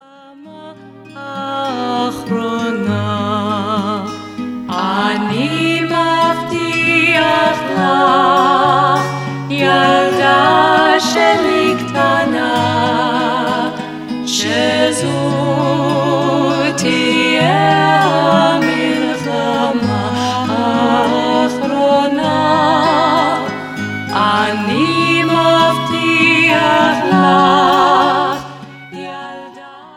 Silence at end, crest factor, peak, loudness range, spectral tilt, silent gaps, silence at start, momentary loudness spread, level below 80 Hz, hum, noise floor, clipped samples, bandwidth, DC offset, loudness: 0 s; 14 dB; 0 dBFS; 6 LU; -5 dB/octave; none; 0.3 s; 11 LU; -52 dBFS; none; -39 dBFS; under 0.1%; 16.5 kHz; under 0.1%; -13 LUFS